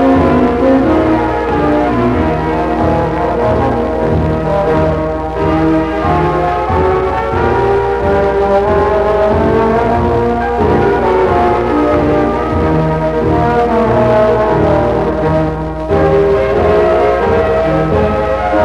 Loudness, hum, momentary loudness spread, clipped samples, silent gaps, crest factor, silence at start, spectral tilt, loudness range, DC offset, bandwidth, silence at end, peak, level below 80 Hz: -12 LUFS; none; 4 LU; under 0.1%; none; 12 dB; 0 s; -8.5 dB/octave; 2 LU; under 0.1%; 11.5 kHz; 0 s; 0 dBFS; -26 dBFS